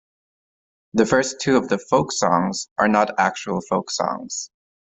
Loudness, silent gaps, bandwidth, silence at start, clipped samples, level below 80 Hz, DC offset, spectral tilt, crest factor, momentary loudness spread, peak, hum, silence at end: -21 LUFS; 2.71-2.76 s; 8.4 kHz; 0.95 s; under 0.1%; -58 dBFS; under 0.1%; -4 dB/octave; 20 dB; 9 LU; -2 dBFS; none; 0.45 s